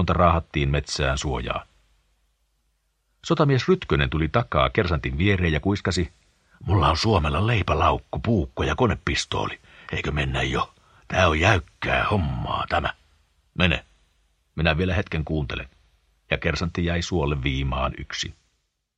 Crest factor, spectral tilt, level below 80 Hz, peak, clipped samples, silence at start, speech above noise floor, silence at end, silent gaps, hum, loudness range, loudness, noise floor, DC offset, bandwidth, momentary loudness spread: 24 dB; -5.5 dB/octave; -34 dBFS; -2 dBFS; under 0.1%; 0 s; 50 dB; 0.65 s; none; none; 4 LU; -24 LUFS; -72 dBFS; under 0.1%; 10 kHz; 10 LU